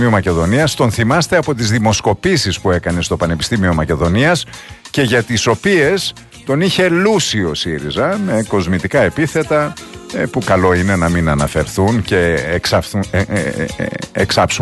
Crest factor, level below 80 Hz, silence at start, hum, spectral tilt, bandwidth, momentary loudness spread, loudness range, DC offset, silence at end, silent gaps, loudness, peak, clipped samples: 14 dB; -34 dBFS; 0 s; none; -5 dB/octave; 12.5 kHz; 7 LU; 1 LU; under 0.1%; 0 s; none; -15 LUFS; 0 dBFS; under 0.1%